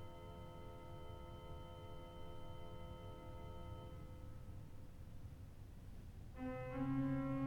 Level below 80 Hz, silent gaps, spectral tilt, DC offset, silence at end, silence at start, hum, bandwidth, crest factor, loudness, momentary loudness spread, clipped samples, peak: -56 dBFS; none; -8 dB/octave; under 0.1%; 0 s; 0 s; none; 19 kHz; 18 dB; -51 LUFS; 15 LU; under 0.1%; -30 dBFS